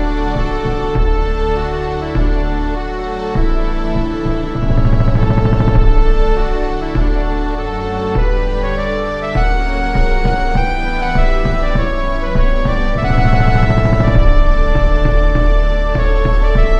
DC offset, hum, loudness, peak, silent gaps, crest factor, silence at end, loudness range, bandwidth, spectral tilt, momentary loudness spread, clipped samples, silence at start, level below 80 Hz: under 0.1%; none; -16 LUFS; 0 dBFS; none; 12 dB; 0 s; 4 LU; 6.2 kHz; -7.5 dB/octave; 6 LU; under 0.1%; 0 s; -14 dBFS